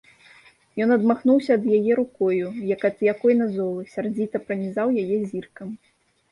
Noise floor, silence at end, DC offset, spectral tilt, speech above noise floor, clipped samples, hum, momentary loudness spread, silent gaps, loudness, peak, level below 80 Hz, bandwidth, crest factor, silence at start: -53 dBFS; 0.55 s; under 0.1%; -8.5 dB/octave; 31 dB; under 0.1%; none; 14 LU; none; -22 LUFS; -8 dBFS; -68 dBFS; 11 kHz; 16 dB; 0.75 s